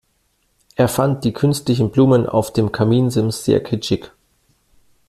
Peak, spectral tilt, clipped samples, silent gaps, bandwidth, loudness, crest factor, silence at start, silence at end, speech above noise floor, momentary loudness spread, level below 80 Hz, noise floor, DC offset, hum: -2 dBFS; -6.5 dB/octave; under 0.1%; none; 15 kHz; -17 LUFS; 16 dB; 0.8 s; 1 s; 48 dB; 7 LU; -48 dBFS; -64 dBFS; under 0.1%; none